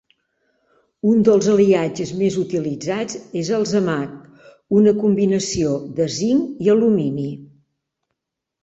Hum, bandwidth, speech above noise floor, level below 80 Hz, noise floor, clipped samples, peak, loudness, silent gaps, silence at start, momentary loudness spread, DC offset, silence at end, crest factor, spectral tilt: none; 8.2 kHz; 64 dB; -54 dBFS; -82 dBFS; under 0.1%; -2 dBFS; -19 LUFS; none; 1.05 s; 11 LU; under 0.1%; 1.15 s; 16 dB; -6 dB/octave